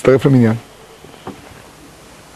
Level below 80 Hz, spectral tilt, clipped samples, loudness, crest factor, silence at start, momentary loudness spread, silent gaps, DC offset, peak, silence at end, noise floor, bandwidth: -48 dBFS; -8 dB/octave; under 0.1%; -13 LUFS; 16 dB; 0.05 s; 23 LU; none; under 0.1%; 0 dBFS; 1 s; -40 dBFS; 13 kHz